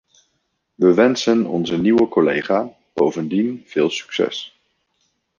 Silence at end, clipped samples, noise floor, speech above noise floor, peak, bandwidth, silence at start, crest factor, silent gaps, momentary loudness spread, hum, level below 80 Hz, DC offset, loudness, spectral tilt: 0.9 s; under 0.1%; -71 dBFS; 53 dB; -2 dBFS; 7.2 kHz; 0.8 s; 18 dB; none; 7 LU; none; -60 dBFS; under 0.1%; -18 LUFS; -5.5 dB/octave